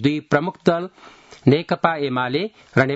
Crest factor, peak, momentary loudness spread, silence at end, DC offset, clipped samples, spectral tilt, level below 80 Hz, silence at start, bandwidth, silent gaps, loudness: 20 dB; 0 dBFS; 6 LU; 0 s; under 0.1%; under 0.1%; -7.5 dB/octave; -58 dBFS; 0 s; 8 kHz; none; -21 LUFS